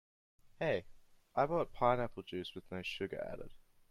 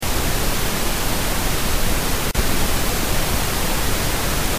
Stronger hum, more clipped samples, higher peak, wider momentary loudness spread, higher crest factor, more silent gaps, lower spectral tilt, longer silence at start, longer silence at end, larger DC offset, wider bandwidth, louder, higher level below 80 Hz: neither; neither; second, -16 dBFS vs -6 dBFS; first, 12 LU vs 1 LU; first, 22 dB vs 12 dB; neither; first, -6.5 dB/octave vs -3 dB/octave; first, 0.45 s vs 0 s; first, 0.3 s vs 0 s; neither; second, 14 kHz vs 15.5 kHz; second, -38 LUFS vs -21 LUFS; second, -58 dBFS vs -24 dBFS